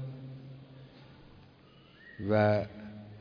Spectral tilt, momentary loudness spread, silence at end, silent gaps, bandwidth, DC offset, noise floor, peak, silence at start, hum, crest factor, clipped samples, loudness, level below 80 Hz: -9.5 dB/octave; 27 LU; 0 s; none; 5.2 kHz; under 0.1%; -58 dBFS; -16 dBFS; 0 s; none; 20 dB; under 0.1%; -30 LUFS; -66 dBFS